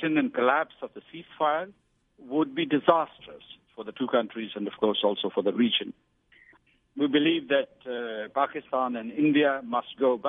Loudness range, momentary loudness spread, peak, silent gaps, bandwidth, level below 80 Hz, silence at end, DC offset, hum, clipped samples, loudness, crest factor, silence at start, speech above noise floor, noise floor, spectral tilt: 2 LU; 18 LU; -4 dBFS; none; 3.9 kHz; -74 dBFS; 0 s; under 0.1%; none; under 0.1%; -27 LUFS; 22 dB; 0 s; 34 dB; -61 dBFS; -8.5 dB/octave